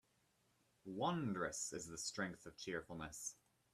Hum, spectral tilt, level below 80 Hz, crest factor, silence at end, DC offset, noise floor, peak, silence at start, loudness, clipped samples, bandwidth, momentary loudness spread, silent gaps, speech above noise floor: none; -3.5 dB/octave; -74 dBFS; 20 dB; 0.4 s; under 0.1%; -79 dBFS; -26 dBFS; 0.85 s; -45 LUFS; under 0.1%; 14.5 kHz; 10 LU; none; 34 dB